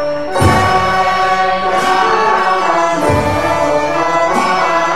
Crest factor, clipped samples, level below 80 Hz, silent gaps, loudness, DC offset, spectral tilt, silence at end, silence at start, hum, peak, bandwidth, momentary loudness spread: 12 dB; under 0.1%; -36 dBFS; none; -12 LUFS; 3%; -5 dB/octave; 0 s; 0 s; none; 0 dBFS; 15 kHz; 2 LU